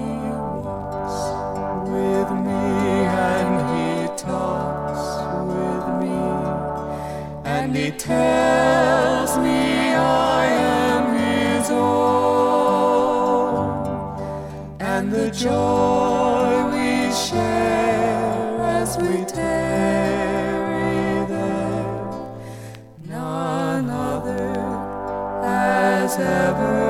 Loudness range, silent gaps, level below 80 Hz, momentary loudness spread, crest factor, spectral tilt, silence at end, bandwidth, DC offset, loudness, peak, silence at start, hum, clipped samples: 7 LU; none; -44 dBFS; 10 LU; 16 dB; -5.5 dB/octave; 0 s; 16.5 kHz; under 0.1%; -21 LUFS; -4 dBFS; 0 s; none; under 0.1%